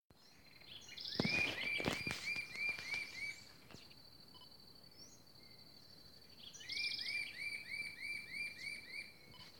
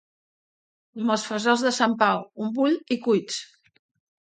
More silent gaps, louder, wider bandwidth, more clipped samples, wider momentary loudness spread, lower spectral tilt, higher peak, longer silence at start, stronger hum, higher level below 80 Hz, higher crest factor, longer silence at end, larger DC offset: first, 0.04-0.10 s vs none; second, -41 LUFS vs -24 LUFS; first, 18 kHz vs 9.4 kHz; neither; first, 21 LU vs 10 LU; about the same, -3 dB/octave vs -4 dB/octave; second, -20 dBFS vs -4 dBFS; second, 0 s vs 0.95 s; neither; about the same, -72 dBFS vs -76 dBFS; first, 26 dB vs 20 dB; second, 0 s vs 0.75 s; neither